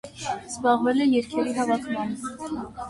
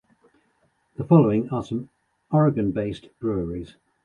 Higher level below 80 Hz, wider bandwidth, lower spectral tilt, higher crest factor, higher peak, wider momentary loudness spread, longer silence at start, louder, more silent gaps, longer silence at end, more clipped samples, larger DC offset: second, -56 dBFS vs -50 dBFS; first, 11.5 kHz vs 7 kHz; second, -4.5 dB/octave vs -10 dB/octave; about the same, 16 dB vs 20 dB; second, -10 dBFS vs -4 dBFS; second, 12 LU vs 18 LU; second, 0.05 s vs 1 s; about the same, -25 LUFS vs -23 LUFS; neither; second, 0 s vs 0.4 s; neither; neither